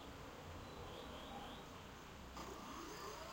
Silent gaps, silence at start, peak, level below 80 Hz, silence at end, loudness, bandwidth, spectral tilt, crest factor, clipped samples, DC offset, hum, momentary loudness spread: none; 0 s; -38 dBFS; -62 dBFS; 0 s; -53 LUFS; 16 kHz; -4 dB/octave; 14 dB; under 0.1%; under 0.1%; none; 4 LU